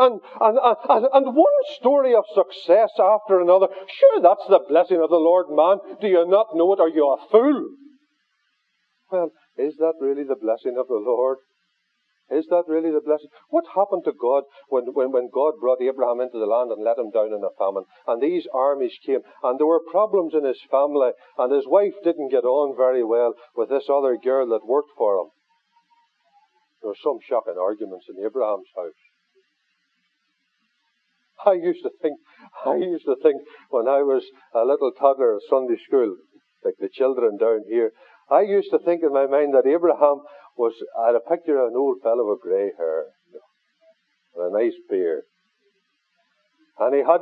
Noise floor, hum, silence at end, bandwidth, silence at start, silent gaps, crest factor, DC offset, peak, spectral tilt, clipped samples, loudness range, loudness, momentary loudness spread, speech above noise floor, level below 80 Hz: -72 dBFS; none; 0 s; 4.8 kHz; 0 s; none; 18 dB; under 0.1%; -2 dBFS; -8 dB/octave; under 0.1%; 11 LU; -21 LUFS; 10 LU; 52 dB; under -90 dBFS